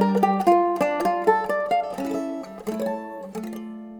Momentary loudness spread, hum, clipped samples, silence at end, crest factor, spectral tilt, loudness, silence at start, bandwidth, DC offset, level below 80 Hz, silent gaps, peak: 14 LU; none; under 0.1%; 0 s; 18 dB; -6.5 dB/octave; -23 LUFS; 0 s; over 20 kHz; under 0.1%; -60 dBFS; none; -6 dBFS